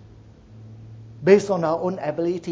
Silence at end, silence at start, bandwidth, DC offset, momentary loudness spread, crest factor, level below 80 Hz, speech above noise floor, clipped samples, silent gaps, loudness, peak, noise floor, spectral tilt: 0 s; 0.5 s; 8 kHz; under 0.1%; 25 LU; 22 dB; -56 dBFS; 27 dB; under 0.1%; none; -21 LUFS; -2 dBFS; -47 dBFS; -7 dB/octave